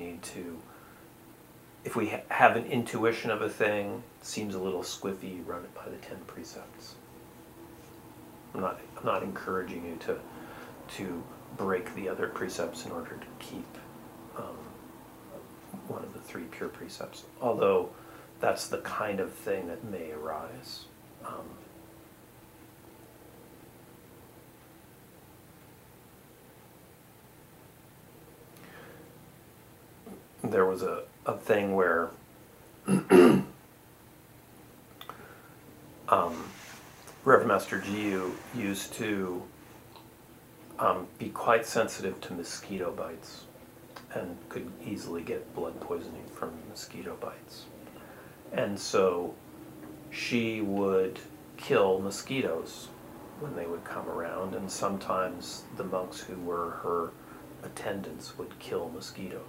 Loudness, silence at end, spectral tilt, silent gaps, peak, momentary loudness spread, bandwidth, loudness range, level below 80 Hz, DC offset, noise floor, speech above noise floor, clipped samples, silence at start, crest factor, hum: -31 LUFS; 0 s; -5 dB/octave; none; -4 dBFS; 25 LU; 16 kHz; 17 LU; -66 dBFS; under 0.1%; -55 dBFS; 24 dB; under 0.1%; 0 s; 30 dB; none